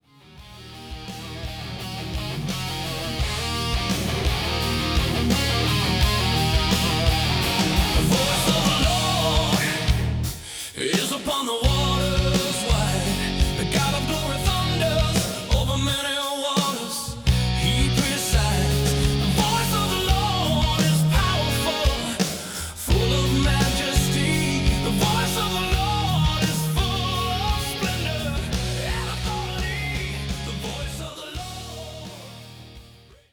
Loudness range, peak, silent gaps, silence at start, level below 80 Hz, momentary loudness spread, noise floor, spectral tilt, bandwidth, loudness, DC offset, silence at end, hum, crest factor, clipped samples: 7 LU; -6 dBFS; none; 0.3 s; -30 dBFS; 11 LU; -49 dBFS; -4 dB/octave; over 20 kHz; -22 LUFS; under 0.1%; 0.35 s; none; 16 dB; under 0.1%